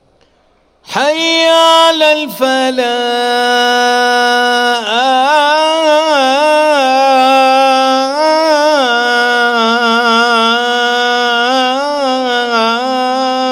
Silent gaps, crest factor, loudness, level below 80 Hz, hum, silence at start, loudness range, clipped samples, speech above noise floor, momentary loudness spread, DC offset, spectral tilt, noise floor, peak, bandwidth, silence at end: none; 10 dB; -10 LUFS; -58 dBFS; none; 0.9 s; 2 LU; under 0.1%; 42 dB; 5 LU; under 0.1%; -1.5 dB/octave; -52 dBFS; 0 dBFS; 16.5 kHz; 0 s